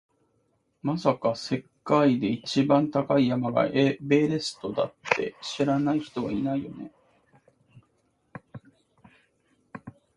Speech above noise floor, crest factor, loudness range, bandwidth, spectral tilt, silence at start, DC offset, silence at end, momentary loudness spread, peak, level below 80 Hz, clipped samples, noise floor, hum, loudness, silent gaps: 46 dB; 24 dB; 10 LU; 11 kHz; -6.5 dB/octave; 0.85 s; under 0.1%; 0.25 s; 20 LU; -2 dBFS; -64 dBFS; under 0.1%; -71 dBFS; none; -26 LUFS; none